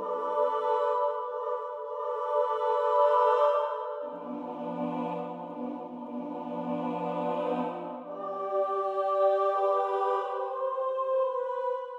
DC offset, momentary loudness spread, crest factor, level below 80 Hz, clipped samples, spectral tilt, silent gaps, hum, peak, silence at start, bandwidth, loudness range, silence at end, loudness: under 0.1%; 12 LU; 16 dB; -82 dBFS; under 0.1%; -7 dB/octave; none; none; -12 dBFS; 0 s; 7.6 kHz; 7 LU; 0 s; -30 LUFS